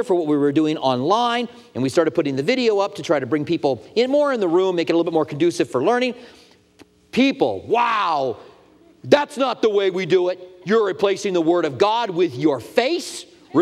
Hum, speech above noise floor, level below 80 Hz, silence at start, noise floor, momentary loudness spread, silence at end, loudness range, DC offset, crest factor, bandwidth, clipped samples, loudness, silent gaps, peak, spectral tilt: none; 33 dB; -66 dBFS; 0 s; -52 dBFS; 7 LU; 0 s; 2 LU; under 0.1%; 20 dB; 13 kHz; under 0.1%; -20 LUFS; none; 0 dBFS; -5.5 dB/octave